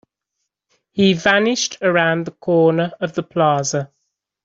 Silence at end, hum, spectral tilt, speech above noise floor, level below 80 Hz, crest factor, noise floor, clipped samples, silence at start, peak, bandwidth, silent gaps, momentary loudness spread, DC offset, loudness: 0.6 s; none; -4.5 dB/octave; 61 dB; -60 dBFS; 16 dB; -77 dBFS; under 0.1%; 0.95 s; -2 dBFS; 7.8 kHz; none; 9 LU; under 0.1%; -17 LUFS